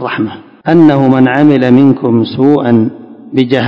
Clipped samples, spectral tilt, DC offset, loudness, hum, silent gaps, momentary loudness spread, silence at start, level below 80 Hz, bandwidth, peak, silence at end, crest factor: 3%; -9 dB/octave; under 0.1%; -9 LUFS; none; none; 11 LU; 0 s; -50 dBFS; 6 kHz; 0 dBFS; 0 s; 8 dB